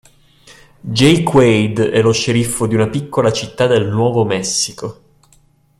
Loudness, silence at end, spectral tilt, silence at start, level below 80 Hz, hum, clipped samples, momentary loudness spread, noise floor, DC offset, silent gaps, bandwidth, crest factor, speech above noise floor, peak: -14 LUFS; 0.9 s; -5 dB/octave; 0.5 s; -46 dBFS; none; under 0.1%; 9 LU; -52 dBFS; under 0.1%; none; 14.5 kHz; 16 dB; 38 dB; 0 dBFS